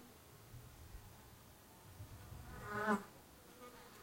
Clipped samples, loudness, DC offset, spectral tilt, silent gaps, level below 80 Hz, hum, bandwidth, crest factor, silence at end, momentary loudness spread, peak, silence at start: under 0.1%; -47 LUFS; under 0.1%; -5.5 dB/octave; none; -64 dBFS; none; 16.5 kHz; 24 dB; 0 s; 21 LU; -24 dBFS; 0 s